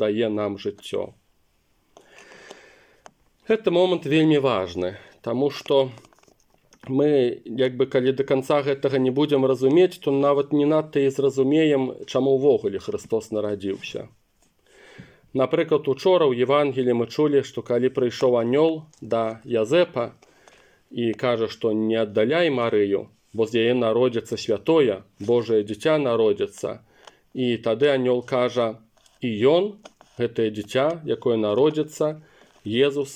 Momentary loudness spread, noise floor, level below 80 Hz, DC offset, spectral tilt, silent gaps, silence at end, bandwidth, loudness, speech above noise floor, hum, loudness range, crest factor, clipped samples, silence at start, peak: 10 LU; -65 dBFS; -68 dBFS; under 0.1%; -6.5 dB/octave; none; 0 s; 12 kHz; -22 LUFS; 44 dB; none; 4 LU; 16 dB; under 0.1%; 0 s; -6 dBFS